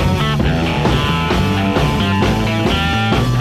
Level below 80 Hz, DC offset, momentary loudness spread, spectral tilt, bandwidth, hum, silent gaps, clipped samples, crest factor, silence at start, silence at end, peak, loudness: -26 dBFS; 0.8%; 1 LU; -6 dB/octave; 15 kHz; none; none; under 0.1%; 12 dB; 0 s; 0 s; -2 dBFS; -15 LUFS